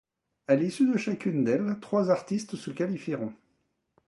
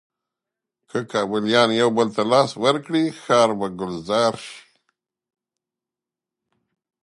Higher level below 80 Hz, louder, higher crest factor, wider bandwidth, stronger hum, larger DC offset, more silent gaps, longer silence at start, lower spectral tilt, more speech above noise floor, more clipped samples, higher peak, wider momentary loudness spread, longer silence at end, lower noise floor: second, -74 dBFS vs -64 dBFS; second, -28 LUFS vs -20 LUFS; about the same, 20 dB vs 20 dB; about the same, 11.5 kHz vs 11.5 kHz; neither; neither; neither; second, 0.5 s vs 0.95 s; first, -7 dB/octave vs -4.5 dB/octave; second, 47 dB vs 68 dB; neither; second, -10 dBFS vs -2 dBFS; second, 9 LU vs 12 LU; second, 0.75 s vs 2.45 s; second, -75 dBFS vs -88 dBFS